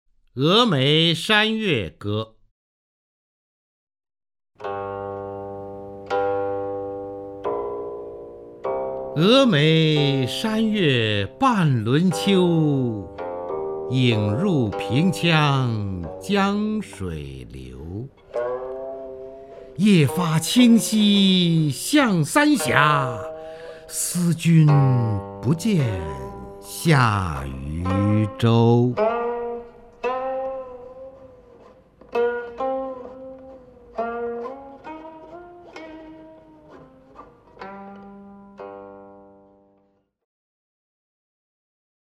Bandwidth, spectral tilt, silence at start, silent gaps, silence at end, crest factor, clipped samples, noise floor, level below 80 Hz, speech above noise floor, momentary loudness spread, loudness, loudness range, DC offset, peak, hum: 16 kHz; -5.5 dB/octave; 0.35 s; 2.51-3.87 s; 3 s; 22 dB; under 0.1%; -64 dBFS; -50 dBFS; 45 dB; 22 LU; -21 LUFS; 18 LU; under 0.1%; 0 dBFS; none